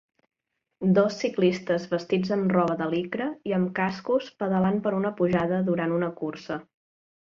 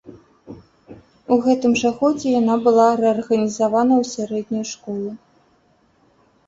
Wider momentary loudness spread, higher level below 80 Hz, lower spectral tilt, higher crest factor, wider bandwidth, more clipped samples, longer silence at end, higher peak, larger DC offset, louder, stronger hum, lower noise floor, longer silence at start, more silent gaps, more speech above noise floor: second, 7 LU vs 13 LU; about the same, -64 dBFS vs -60 dBFS; first, -7.5 dB/octave vs -5 dB/octave; about the same, 18 dB vs 18 dB; second, 7.2 kHz vs 8 kHz; neither; second, 0.8 s vs 1.3 s; second, -8 dBFS vs -2 dBFS; neither; second, -26 LUFS vs -18 LUFS; neither; about the same, -57 dBFS vs -59 dBFS; first, 0.8 s vs 0.05 s; neither; second, 32 dB vs 41 dB